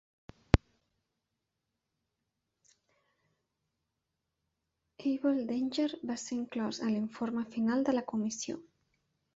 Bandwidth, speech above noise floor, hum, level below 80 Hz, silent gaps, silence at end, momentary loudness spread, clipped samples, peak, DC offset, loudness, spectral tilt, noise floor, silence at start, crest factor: 8 kHz; 53 dB; none; -48 dBFS; none; 0.75 s; 7 LU; under 0.1%; -2 dBFS; under 0.1%; -34 LUFS; -6 dB/octave; -86 dBFS; 0.55 s; 34 dB